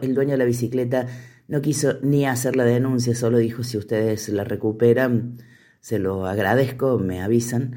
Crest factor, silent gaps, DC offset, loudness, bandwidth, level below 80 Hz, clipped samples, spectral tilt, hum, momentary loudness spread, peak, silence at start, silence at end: 16 dB; none; under 0.1%; -21 LUFS; 17 kHz; -58 dBFS; under 0.1%; -6.5 dB/octave; none; 6 LU; -6 dBFS; 0 s; 0 s